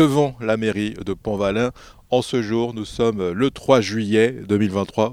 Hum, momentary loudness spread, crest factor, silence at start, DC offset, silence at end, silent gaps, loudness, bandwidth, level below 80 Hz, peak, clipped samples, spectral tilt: none; 8 LU; 20 dB; 0 s; under 0.1%; 0 s; none; -21 LUFS; 15.5 kHz; -48 dBFS; 0 dBFS; under 0.1%; -6 dB/octave